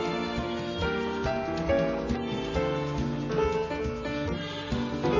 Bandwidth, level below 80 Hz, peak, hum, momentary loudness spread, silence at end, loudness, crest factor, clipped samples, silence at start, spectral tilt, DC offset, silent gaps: 7.6 kHz; -42 dBFS; -14 dBFS; none; 5 LU; 0 s; -30 LUFS; 16 dB; under 0.1%; 0 s; -6.5 dB/octave; under 0.1%; none